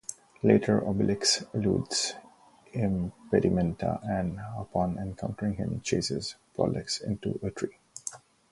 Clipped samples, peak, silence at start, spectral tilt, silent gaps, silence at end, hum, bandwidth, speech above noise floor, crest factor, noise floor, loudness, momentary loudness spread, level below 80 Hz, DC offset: under 0.1%; -6 dBFS; 0.1 s; -5 dB/octave; none; 0.35 s; none; 11.5 kHz; 28 dB; 24 dB; -56 dBFS; -29 LUFS; 13 LU; -50 dBFS; under 0.1%